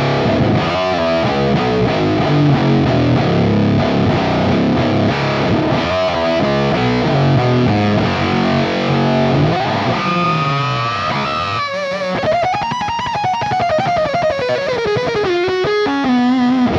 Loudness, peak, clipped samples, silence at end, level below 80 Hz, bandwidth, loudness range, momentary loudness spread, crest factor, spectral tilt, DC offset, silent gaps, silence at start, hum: -15 LUFS; -4 dBFS; under 0.1%; 0 s; -38 dBFS; 7.6 kHz; 3 LU; 4 LU; 12 dB; -7 dB/octave; under 0.1%; none; 0 s; none